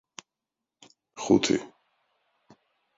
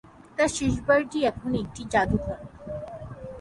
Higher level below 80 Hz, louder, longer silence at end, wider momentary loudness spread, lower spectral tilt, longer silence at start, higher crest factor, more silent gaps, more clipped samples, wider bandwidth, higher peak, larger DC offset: second, -64 dBFS vs -44 dBFS; about the same, -25 LUFS vs -26 LUFS; first, 1.3 s vs 0 s; first, 26 LU vs 16 LU; about the same, -4.5 dB/octave vs -5 dB/octave; first, 1.15 s vs 0.05 s; first, 24 dB vs 18 dB; neither; neither; second, 7.8 kHz vs 11.5 kHz; about the same, -8 dBFS vs -8 dBFS; neither